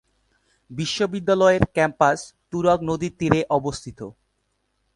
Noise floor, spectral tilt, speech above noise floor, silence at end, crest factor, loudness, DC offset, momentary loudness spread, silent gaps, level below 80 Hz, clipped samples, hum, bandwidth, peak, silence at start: -72 dBFS; -5.5 dB/octave; 51 dB; 0.85 s; 22 dB; -21 LUFS; under 0.1%; 17 LU; none; -46 dBFS; under 0.1%; none; 11.5 kHz; 0 dBFS; 0.7 s